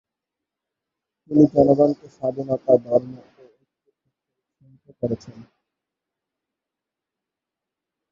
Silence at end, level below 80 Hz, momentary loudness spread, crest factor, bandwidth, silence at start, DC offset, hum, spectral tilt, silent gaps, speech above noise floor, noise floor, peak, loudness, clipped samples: 2.8 s; -58 dBFS; 14 LU; 22 dB; 7 kHz; 1.3 s; under 0.1%; none; -10.5 dB/octave; none; 67 dB; -86 dBFS; -2 dBFS; -20 LUFS; under 0.1%